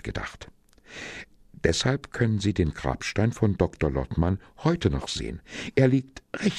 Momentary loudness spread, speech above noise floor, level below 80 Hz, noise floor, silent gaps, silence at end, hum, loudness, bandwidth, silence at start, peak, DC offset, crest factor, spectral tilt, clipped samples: 15 LU; 20 dB; -40 dBFS; -46 dBFS; none; 0 s; none; -26 LUFS; 11.5 kHz; 0.05 s; -6 dBFS; under 0.1%; 20 dB; -6 dB/octave; under 0.1%